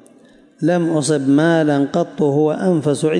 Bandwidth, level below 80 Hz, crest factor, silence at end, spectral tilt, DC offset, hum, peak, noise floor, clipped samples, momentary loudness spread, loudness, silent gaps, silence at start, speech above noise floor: 11.5 kHz; -66 dBFS; 12 dB; 0 s; -6.5 dB/octave; under 0.1%; none; -6 dBFS; -48 dBFS; under 0.1%; 4 LU; -16 LUFS; none; 0.6 s; 32 dB